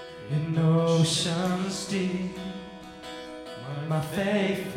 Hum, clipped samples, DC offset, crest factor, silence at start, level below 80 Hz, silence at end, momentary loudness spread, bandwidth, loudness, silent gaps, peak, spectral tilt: none; under 0.1%; under 0.1%; 16 dB; 0 s; -58 dBFS; 0 s; 17 LU; 15.5 kHz; -27 LUFS; none; -12 dBFS; -5.5 dB/octave